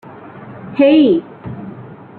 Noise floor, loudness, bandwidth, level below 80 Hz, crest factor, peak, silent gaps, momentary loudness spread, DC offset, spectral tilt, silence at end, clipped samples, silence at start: -34 dBFS; -12 LUFS; 4.5 kHz; -54 dBFS; 14 dB; -2 dBFS; none; 25 LU; under 0.1%; -9.5 dB/octave; 0.25 s; under 0.1%; 0.35 s